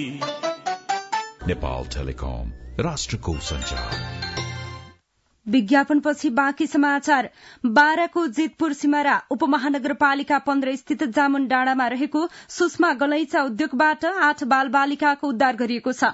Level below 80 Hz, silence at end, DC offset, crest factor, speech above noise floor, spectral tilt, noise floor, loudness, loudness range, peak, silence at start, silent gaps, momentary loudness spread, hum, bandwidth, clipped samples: -40 dBFS; 0 s; under 0.1%; 18 dB; 43 dB; -4.5 dB/octave; -65 dBFS; -22 LUFS; 8 LU; -4 dBFS; 0 s; none; 11 LU; none; 8 kHz; under 0.1%